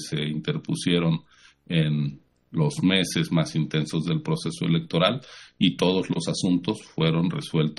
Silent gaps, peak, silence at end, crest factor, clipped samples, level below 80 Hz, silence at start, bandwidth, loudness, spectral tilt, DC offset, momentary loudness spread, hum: none; -6 dBFS; 0.05 s; 20 dB; under 0.1%; -58 dBFS; 0 s; 12.5 kHz; -25 LUFS; -6 dB/octave; under 0.1%; 7 LU; none